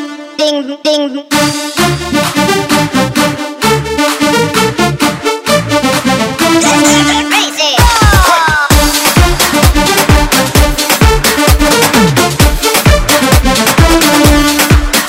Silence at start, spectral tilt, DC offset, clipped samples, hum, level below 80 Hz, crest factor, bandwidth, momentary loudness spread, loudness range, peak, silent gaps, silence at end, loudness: 0 s; -4 dB/octave; under 0.1%; 0.9%; none; -16 dBFS; 8 dB; 17 kHz; 6 LU; 4 LU; 0 dBFS; none; 0 s; -8 LUFS